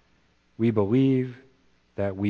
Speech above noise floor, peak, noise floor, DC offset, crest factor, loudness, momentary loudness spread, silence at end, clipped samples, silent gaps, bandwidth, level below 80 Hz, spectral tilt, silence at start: 41 dB; -8 dBFS; -64 dBFS; under 0.1%; 18 dB; -25 LUFS; 13 LU; 0 s; under 0.1%; none; 4.8 kHz; -64 dBFS; -10 dB/octave; 0.6 s